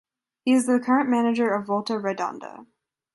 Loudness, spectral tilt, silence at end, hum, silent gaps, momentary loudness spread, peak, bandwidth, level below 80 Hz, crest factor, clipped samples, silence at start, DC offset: -23 LUFS; -5 dB/octave; 0.5 s; none; none; 10 LU; -8 dBFS; 11.5 kHz; -74 dBFS; 16 dB; under 0.1%; 0.45 s; under 0.1%